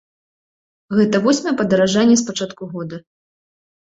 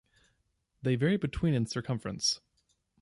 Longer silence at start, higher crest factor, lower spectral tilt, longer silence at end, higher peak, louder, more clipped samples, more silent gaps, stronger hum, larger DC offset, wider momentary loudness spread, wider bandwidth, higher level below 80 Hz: about the same, 0.9 s vs 0.85 s; about the same, 16 dB vs 16 dB; about the same, -4.5 dB/octave vs -5 dB/octave; first, 0.9 s vs 0.65 s; first, -4 dBFS vs -16 dBFS; first, -17 LUFS vs -31 LUFS; neither; neither; neither; neither; first, 15 LU vs 8 LU; second, 8.2 kHz vs 11.5 kHz; second, -58 dBFS vs -52 dBFS